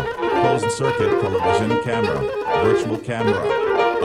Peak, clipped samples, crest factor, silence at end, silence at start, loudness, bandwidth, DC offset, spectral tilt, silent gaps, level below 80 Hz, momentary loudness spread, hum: -4 dBFS; under 0.1%; 14 dB; 0 s; 0 s; -20 LUFS; 13 kHz; under 0.1%; -5.5 dB/octave; none; -48 dBFS; 3 LU; none